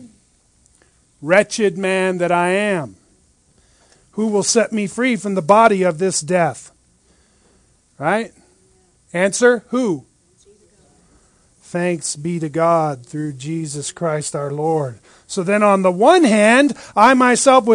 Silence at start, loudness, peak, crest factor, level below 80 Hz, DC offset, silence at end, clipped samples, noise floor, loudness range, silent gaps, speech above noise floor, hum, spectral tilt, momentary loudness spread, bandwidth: 0 s; -16 LUFS; 0 dBFS; 18 dB; -60 dBFS; under 0.1%; 0 s; under 0.1%; -57 dBFS; 7 LU; none; 41 dB; none; -4.5 dB/octave; 14 LU; 10.5 kHz